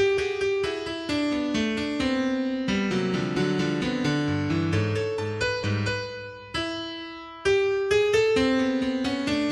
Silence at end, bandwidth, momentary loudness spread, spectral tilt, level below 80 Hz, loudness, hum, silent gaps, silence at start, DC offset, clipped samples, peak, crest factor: 0 s; 12 kHz; 9 LU; -5.5 dB/octave; -50 dBFS; -26 LUFS; none; none; 0 s; under 0.1%; under 0.1%; -10 dBFS; 14 dB